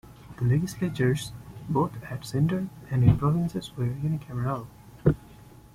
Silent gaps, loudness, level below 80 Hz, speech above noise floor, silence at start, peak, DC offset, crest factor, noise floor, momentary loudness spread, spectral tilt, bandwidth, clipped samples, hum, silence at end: none; -27 LUFS; -46 dBFS; 24 dB; 0.05 s; -6 dBFS; under 0.1%; 22 dB; -49 dBFS; 12 LU; -7.5 dB/octave; 15.5 kHz; under 0.1%; none; 0.4 s